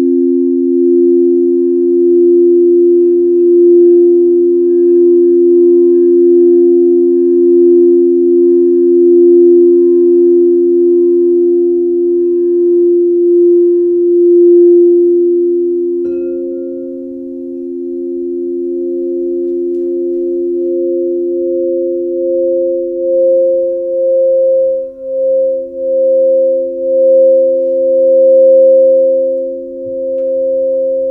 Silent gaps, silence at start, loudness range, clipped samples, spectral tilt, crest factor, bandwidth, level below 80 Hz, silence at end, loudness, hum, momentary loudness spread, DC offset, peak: none; 0 s; 8 LU; under 0.1%; -12 dB/octave; 8 dB; 1.1 kHz; -56 dBFS; 0 s; -10 LUFS; none; 11 LU; under 0.1%; 0 dBFS